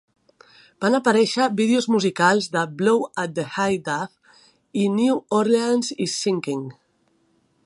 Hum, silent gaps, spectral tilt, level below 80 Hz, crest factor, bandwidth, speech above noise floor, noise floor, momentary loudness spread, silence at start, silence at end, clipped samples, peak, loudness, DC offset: none; none; -4.5 dB/octave; -68 dBFS; 20 dB; 11.5 kHz; 44 dB; -65 dBFS; 9 LU; 0.8 s; 0.95 s; under 0.1%; -2 dBFS; -21 LUFS; under 0.1%